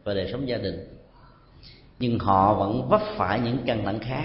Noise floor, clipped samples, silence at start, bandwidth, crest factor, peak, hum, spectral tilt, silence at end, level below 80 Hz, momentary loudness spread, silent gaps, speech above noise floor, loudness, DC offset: -52 dBFS; under 0.1%; 0.05 s; 5.8 kHz; 20 dB; -4 dBFS; none; -11 dB/octave; 0 s; -48 dBFS; 10 LU; none; 28 dB; -25 LUFS; under 0.1%